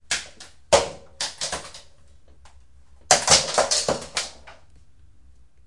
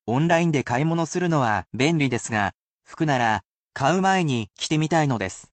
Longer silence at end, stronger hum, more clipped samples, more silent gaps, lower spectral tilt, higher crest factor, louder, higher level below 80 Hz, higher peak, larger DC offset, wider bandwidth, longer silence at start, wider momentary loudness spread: first, 1.15 s vs 0.1 s; neither; neither; second, none vs 2.54-2.79 s, 3.45-3.66 s; second, -0.5 dB/octave vs -5.5 dB/octave; first, 26 dB vs 14 dB; about the same, -21 LUFS vs -23 LUFS; first, -50 dBFS vs -58 dBFS; first, 0 dBFS vs -8 dBFS; first, 0.4% vs under 0.1%; first, 11.5 kHz vs 9 kHz; about the same, 0.1 s vs 0.05 s; first, 17 LU vs 7 LU